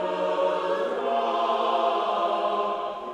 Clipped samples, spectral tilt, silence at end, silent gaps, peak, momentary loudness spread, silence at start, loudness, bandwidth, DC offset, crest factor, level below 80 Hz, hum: under 0.1%; -4.5 dB/octave; 0 s; none; -12 dBFS; 3 LU; 0 s; -25 LUFS; 10 kHz; under 0.1%; 12 dB; -68 dBFS; none